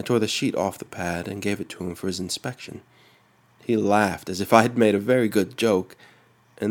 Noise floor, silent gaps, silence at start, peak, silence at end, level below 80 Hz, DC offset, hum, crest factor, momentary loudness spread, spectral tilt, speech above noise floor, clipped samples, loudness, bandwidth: -59 dBFS; none; 0 s; 0 dBFS; 0 s; -60 dBFS; under 0.1%; none; 24 dB; 14 LU; -5 dB/octave; 36 dB; under 0.1%; -23 LUFS; 19 kHz